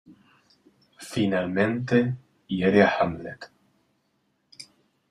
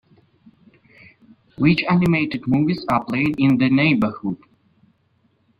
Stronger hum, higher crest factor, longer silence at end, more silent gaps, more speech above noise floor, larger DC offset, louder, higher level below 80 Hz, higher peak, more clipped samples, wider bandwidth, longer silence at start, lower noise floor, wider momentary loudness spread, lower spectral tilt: neither; about the same, 22 dB vs 18 dB; second, 0.45 s vs 1.25 s; neither; about the same, 48 dB vs 45 dB; neither; second, -24 LUFS vs -19 LUFS; second, -60 dBFS vs -52 dBFS; about the same, -4 dBFS vs -4 dBFS; neither; first, 12.5 kHz vs 8.6 kHz; second, 0.1 s vs 1.6 s; first, -72 dBFS vs -63 dBFS; first, 26 LU vs 7 LU; second, -6.5 dB/octave vs -8 dB/octave